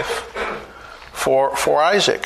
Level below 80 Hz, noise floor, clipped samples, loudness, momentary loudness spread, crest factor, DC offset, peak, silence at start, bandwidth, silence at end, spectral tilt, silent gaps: -48 dBFS; -39 dBFS; under 0.1%; -18 LUFS; 19 LU; 16 dB; under 0.1%; -4 dBFS; 0 s; 13.5 kHz; 0 s; -2.5 dB/octave; none